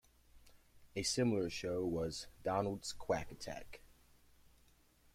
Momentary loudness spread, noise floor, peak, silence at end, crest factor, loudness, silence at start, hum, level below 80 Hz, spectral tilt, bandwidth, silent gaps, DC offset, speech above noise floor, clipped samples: 13 LU; -69 dBFS; -22 dBFS; 1.3 s; 20 dB; -39 LUFS; 0.35 s; none; -62 dBFS; -4.5 dB/octave; 16.5 kHz; none; under 0.1%; 30 dB; under 0.1%